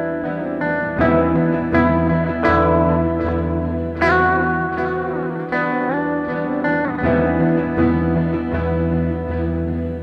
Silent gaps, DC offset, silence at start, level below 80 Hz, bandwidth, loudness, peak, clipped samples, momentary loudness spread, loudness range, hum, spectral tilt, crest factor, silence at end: none; under 0.1%; 0 s; -34 dBFS; 6 kHz; -19 LUFS; -2 dBFS; under 0.1%; 7 LU; 2 LU; none; -9.5 dB/octave; 16 dB; 0 s